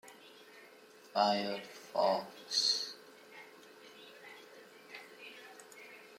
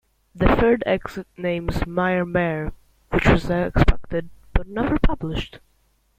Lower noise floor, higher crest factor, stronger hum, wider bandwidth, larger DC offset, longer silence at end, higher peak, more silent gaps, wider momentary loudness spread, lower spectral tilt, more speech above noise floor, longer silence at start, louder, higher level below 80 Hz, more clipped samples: second, -58 dBFS vs -63 dBFS; about the same, 24 dB vs 20 dB; neither; about the same, 16.5 kHz vs 15 kHz; neither; second, 0 s vs 0.6 s; second, -16 dBFS vs -2 dBFS; neither; first, 24 LU vs 11 LU; second, -2 dB/octave vs -7.5 dB/octave; second, 25 dB vs 43 dB; second, 0.05 s vs 0.35 s; second, -34 LUFS vs -22 LUFS; second, under -90 dBFS vs -28 dBFS; neither